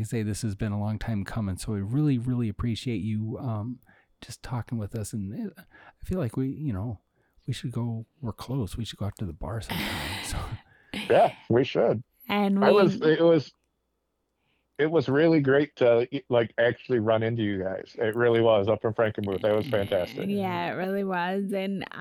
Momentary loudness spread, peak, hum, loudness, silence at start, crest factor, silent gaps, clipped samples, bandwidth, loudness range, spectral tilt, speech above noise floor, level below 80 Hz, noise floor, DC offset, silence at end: 14 LU; -8 dBFS; none; -27 LUFS; 0 s; 18 dB; none; under 0.1%; 18 kHz; 10 LU; -6.5 dB/octave; 51 dB; -50 dBFS; -77 dBFS; under 0.1%; 0 s